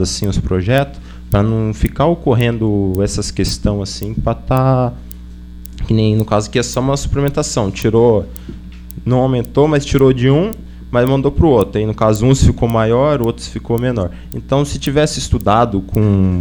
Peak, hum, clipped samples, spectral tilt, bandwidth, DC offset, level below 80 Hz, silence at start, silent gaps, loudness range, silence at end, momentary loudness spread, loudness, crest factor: 0 dBFS; none; under 0.1%; -6.5 dB/octave; over 20 kHz; under 0.1%; -28 dBFS; 0 s; none; 4 LU; 0 s; 13 LU; -15 LUFS; 14 dB